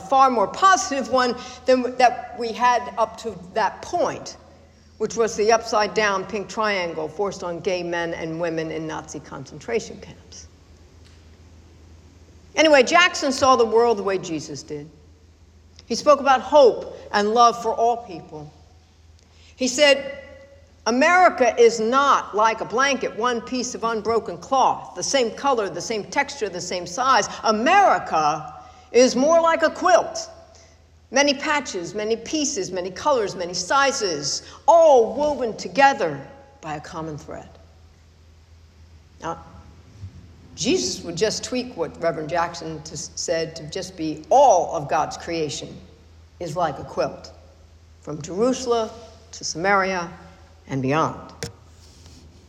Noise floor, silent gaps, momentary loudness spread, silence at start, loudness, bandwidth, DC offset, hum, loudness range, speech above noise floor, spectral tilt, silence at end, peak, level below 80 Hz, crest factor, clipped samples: -51 dBFS; none; 18 LU; 0 s; -21 LUFS; 12.5 kHz; under 0.1%; none; 10 LU; 31 dB; -3 dB/octave; 0.2 s; -4 dBFS; -54 dBFS; 18 dB; under 0.1%